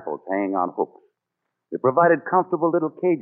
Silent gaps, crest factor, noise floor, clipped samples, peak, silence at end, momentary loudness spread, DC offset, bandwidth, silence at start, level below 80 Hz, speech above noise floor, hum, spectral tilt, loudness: none; 18 dB; -81 dBFS; under 0.1%; -6 dBFS; 0 s; 11 LU; under 0.1%; 2.9 kHz; 0 s; -80 dBFS; 59 dB; none; -9.5 dB/octave; -22 LUFS